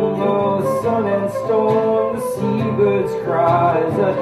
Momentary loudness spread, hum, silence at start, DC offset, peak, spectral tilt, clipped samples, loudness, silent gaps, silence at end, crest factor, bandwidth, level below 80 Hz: 4 LU; none; 0 s; under 0.1%; -4 dBFS; -7.5 dB/octave; under 0.1%; -18 LUFS; none; 0 s; 12 dB; 14 kHz; -54 dBFS